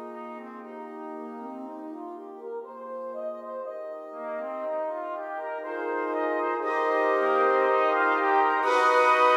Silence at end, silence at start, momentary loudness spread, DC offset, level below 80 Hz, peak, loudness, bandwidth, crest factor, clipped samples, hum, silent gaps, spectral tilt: 0 s; 0 s; 17 LU; under 0.1%; -86 dBFS; -8 dBFS; -26 LUFS; 13 kHz; 18 dB; under 0.1%; none; none; -2.5 dB/octave